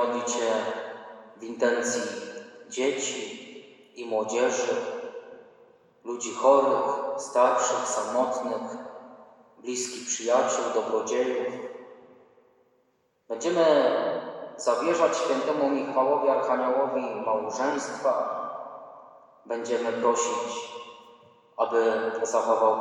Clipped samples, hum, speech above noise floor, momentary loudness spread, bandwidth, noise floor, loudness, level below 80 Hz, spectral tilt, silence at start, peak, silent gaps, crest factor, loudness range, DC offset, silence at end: under 0.1%; none; 44 dB; 18 LU; 11.5 kHz; -69 dBFS; -26 LUFS; -88 dBFS; -2.5 dB/octave; 0 s; -8 dBFS; none; 20 dB; 5 LU; under 0.1%; 0 s